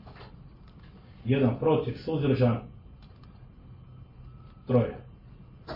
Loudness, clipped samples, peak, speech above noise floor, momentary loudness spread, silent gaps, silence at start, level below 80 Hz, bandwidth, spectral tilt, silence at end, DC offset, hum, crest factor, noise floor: -27 LUFS; under 0.1%; -12 dBFS; 24 dB; 25 LU; none; 0.05 s; -54 dBFS; 5.6 kHz; -10.5 dB/octave; 0 s; under 0.1%; none; 20 dB; -50 dBFS